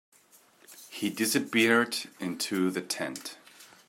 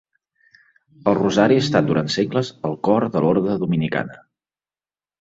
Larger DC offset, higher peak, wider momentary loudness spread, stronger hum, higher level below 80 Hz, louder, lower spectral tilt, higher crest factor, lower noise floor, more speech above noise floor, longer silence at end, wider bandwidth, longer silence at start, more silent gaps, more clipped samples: neither; second, -10 dBFS vs -2 dBFS; first, 20 LU vs 9 LU; neither; second, -78 dBFS vs -56 dBFS; second, -28 LUFS vs -19 LUFS; second, -3 dB/octave vs -6.5 dB/octave; about the same, 22 dB vs 18 dB; second, -61 dBFS vs under -90 dBFS; second, 32 dB vs over 71 dB; second, 0.25 s vs 1.05 s; first, 16 kHz vs 8 kHz; second, 0.7 s vs 1.05 s; neither; neither